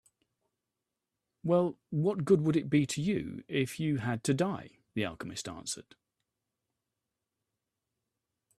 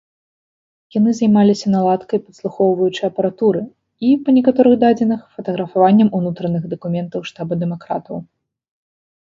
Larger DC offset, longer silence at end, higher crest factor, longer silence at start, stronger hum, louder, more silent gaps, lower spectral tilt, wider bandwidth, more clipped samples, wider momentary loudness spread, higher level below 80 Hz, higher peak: neither; first, 2.8 s vs 1.1 s; about the same, 20 dB vs 16 dB; first, 1.45 s vs 0.95 s; neither; second, -32 LUFS vs -17 LUFS; neither; second, -6 dB/octave vs -8 dB/octave; first, 13.5 kHz vs 7.6 kHz; neither; about the same, 12 LU vs 13 LU; second, -68 dBFS vs -60 dBFS; second, -12 dBFS vs 0 dBFS